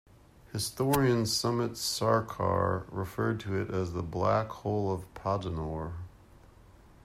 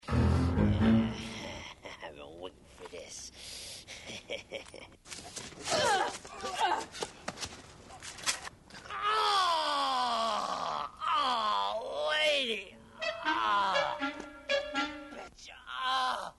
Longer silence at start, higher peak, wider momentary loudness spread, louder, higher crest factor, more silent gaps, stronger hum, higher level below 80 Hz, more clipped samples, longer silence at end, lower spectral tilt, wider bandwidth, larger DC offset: first, 0.5 s vs 0.05 s; about the same, -12 dBFS vs -14 dBFS; second, 10 LU vs 19 LU; about the same, -31 LUFS vs -32 LUFS; about the same, 20 dB vs 18 dB; neither; neither; second, -54 dBFS vs -48 dBFS; neither; first, 0.95 s vs 0.05 s; about the same, -5 dB/octave vs -4 dB/octave; first, 16 kHz vs 11.5 kHz; neither